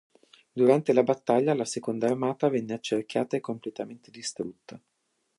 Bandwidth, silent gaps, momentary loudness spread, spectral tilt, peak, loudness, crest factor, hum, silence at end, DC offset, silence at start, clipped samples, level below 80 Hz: 11.5 kHz; none; 15 LU; -5.5 dB/octave; -8 dBFS; -27 LUFS; 20 dB; none; 0.6 s; under 0.1%; 0.55 s; under 0.1%; -76 dBFS